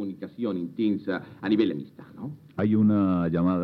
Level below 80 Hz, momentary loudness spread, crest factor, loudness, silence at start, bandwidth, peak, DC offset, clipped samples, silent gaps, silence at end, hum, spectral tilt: -60 dBFS; 17 LU; 16 dB; -26 LUFS; 0 s; 4.8 kHz; -10 dBFS; under 0.1%; under 0.1%; none; 0 s; none; -10 dB/octave